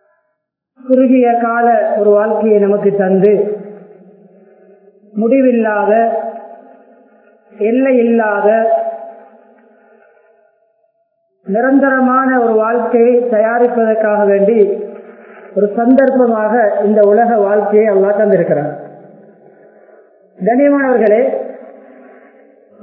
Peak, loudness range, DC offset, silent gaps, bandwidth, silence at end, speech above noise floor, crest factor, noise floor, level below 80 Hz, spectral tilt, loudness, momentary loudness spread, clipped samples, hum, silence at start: 0 dBFS; 5 LU; under 0.1%; none; 3.5 kHz; 1.15 s; 59 dB; 14 dB; -70 dBFS; -66 dBFS; -12 dB/octave; -12 LUFS; 12 LU; under 0.1%; none; 0.85 s